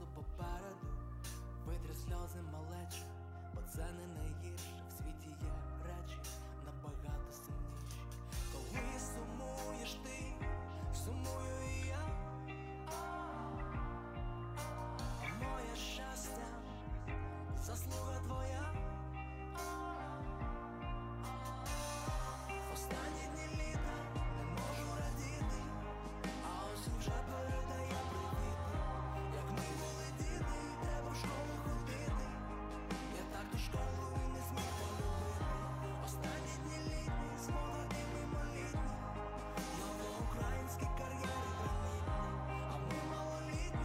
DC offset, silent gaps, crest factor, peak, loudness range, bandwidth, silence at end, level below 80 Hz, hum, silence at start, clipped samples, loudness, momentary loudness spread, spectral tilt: under 0.1%; none; 14 dB; -28 dBFS; 5 LU; 16 kHz; 0 s; -46 dBFS; none; 0 s; under 0.1%; -44 LUFS; 6 LU; -5 dB/octave